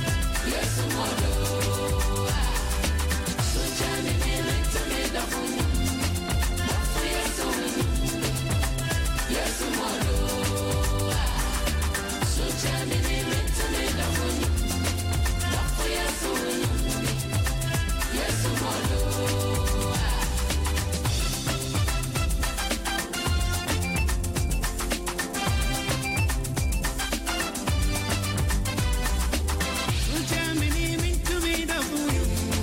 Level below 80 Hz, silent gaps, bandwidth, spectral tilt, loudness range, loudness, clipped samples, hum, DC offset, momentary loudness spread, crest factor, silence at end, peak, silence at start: -30 dBFS; none; 17 kHz; -4 dB/octave; 1 LU; -26 LUFS; under 0.1%; none; under 0.1%; 2 LU; 10 dB; 0 s; -16 dBFS; 0 s